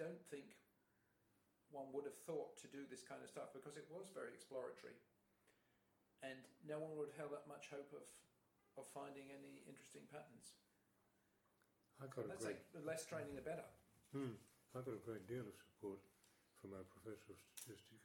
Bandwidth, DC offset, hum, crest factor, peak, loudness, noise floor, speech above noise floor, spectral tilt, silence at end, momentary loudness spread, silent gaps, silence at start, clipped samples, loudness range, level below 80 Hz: 19 kHz; under 0.1%; none; 20 dB; -36 dBFS; -55 LUFS; -82 dBFS; 28 dB; -5 dB/octave; 0 s; 11 LU; none; 0 s; under 0.1%; 7 LU; -86 dBFS